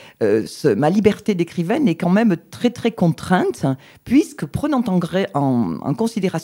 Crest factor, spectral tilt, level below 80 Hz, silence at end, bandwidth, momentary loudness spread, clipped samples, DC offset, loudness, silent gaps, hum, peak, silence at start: 18 dB; -7 dB/octave; -52 dBFS; 0 s; 16.5 kHz; 6 LU; under 0.1%; under 0.1%; -19 LUFS; none; none; -2 dBFS; 0.2 s